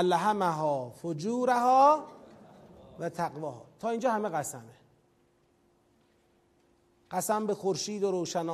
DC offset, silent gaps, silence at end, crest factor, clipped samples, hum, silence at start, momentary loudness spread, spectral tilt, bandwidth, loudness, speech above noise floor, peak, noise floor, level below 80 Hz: under 0.1%; none; 0 s; 20 dB; under 0.1%; none; 0 s; 16 LU; -4.5 dB/octave; 15 kHz; -29 LUFS; 39 dB; -10 dBFS; -68 dBFS; -74 dBFS